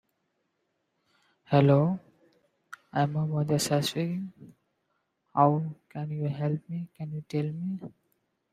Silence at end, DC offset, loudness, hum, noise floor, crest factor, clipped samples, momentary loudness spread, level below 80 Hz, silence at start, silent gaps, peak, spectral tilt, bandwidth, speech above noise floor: 0.65 s; under 0.1%; -28 LUFS; none; -78 dBFS; 24 dB; under 0.1%; 15 LU; -68 dBFS; 1.5 s; none; -6 dBFS; -6.5 dB/octave; 14.5 kHz; 50 dB